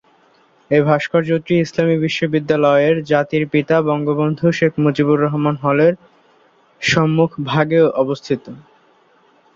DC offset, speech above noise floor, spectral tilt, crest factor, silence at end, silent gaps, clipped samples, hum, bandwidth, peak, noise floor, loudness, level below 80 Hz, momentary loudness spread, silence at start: under 0.1%; 38 dB; -6.5 dB/octave; 16 dB; 0.95 s; none; under 0.1%; none; 7.6 kHz; -2 dBFS; -54 dBFS; -16 LUFS; -56 dBFS; 4 LU; 0.7 s